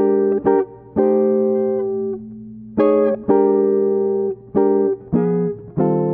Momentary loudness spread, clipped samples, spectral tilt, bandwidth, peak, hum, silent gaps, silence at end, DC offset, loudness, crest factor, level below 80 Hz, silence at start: 8 LU; under 0.1%; -10 dB/octave; 3.5 kHz; -4 dBFS; 60 Hz at -50 dBFS; none; 0 s; under 0.1%; -18 LUFS; 14 dB; -54 dBFS; 0 s